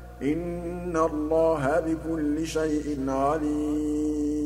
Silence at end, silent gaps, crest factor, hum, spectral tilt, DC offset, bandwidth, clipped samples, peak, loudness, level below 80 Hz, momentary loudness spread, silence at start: 0 s; none; 16 dB; 60 Hz at -40 dBFS; -6.5 dB/octave; under 0.1%; 13.5 kHz; under 0.1%; -10 dBFS; -27 LUFS; -42 dBFS; 6 LU; 0 s